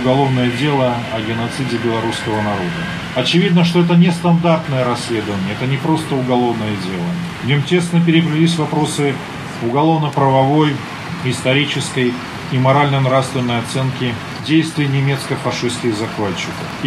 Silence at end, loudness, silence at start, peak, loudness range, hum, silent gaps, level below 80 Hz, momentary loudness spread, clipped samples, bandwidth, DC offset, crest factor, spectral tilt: 0 s; -16 LUFS; 0 s; 0 dBFS; 3 LU; none; none; -48 dBFS; 8 LU; under 0.1%; 13 kHz; under 0.1%; 14 dB; -6 dB/octave